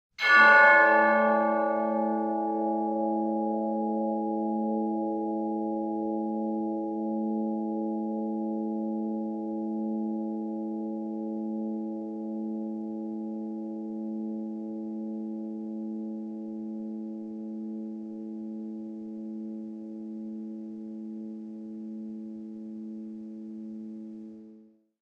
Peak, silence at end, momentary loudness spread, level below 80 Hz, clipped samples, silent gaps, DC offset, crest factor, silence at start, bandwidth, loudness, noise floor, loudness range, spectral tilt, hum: -8 dBFS; 0.4 s; 16 LU; -82 dBFS; under 0.1%; none; under 0.1%; 22 dB; 0.2 s; 6.6 kHz; -28 LUFS; -56 dBFS; 12 LU; -6.5 dB/octave; none